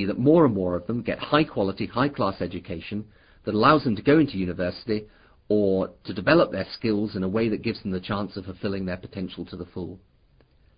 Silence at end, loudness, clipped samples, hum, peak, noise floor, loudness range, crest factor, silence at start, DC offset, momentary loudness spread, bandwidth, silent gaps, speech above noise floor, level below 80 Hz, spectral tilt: 0.8 s; -25 LUFS; under 0.1%; none; -4 dBFS; -60 dBFS; 6 LU; 20 dB; 0 s; under 0.1%; 15 LU; 5.2 kHz; none; 35 dB; -50 dBFS; -11 dB/octave